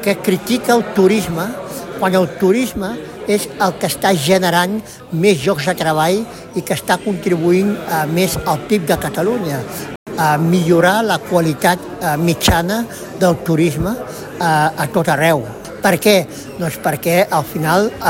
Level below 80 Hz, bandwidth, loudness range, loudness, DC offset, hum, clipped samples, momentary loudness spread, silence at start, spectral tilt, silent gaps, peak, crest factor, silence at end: -40 dBFS; 17 kHz; 2 LU; -16 LUFS; under 0.1%; none; under 0.1%; 10 LU; 0 s; -5 dB/octave; 9.96-10.06 s; 0 dBFS; 16 dB; 0 s